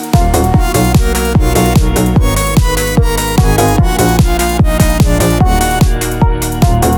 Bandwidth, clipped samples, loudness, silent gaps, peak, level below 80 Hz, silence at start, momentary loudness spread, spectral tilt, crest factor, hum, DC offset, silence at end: over 20 kHz; under 0.1%; -11 LUFS; none; 0 dBFS; -14 dBFS; 0 s; 2 LU; -5.5 dB/octave; 10 dB; none; under 0.1%; 0 s